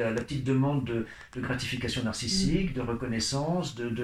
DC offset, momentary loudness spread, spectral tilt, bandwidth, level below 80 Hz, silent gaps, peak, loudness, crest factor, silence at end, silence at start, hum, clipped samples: 0.1%; 7 LU; -5 dB/octave; 14.5 kHz; -46 dBFS; none; -14 dBFS; -30 LUFS; 16 dB; 0 s; 0 s; none; under 0.1%